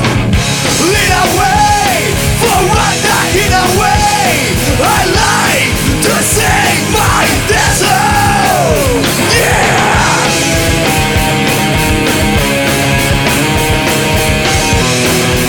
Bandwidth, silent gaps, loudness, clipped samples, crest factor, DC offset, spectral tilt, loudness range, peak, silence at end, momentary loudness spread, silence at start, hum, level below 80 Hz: 19.5 kHz; none; -9 LUFS; under 0.1%; 10 dB; under 0.1%; -3.5 dB/octave; 1 LU; 0 dBFS; 0 s; 2 LU; 0 s; none; -22 dBFS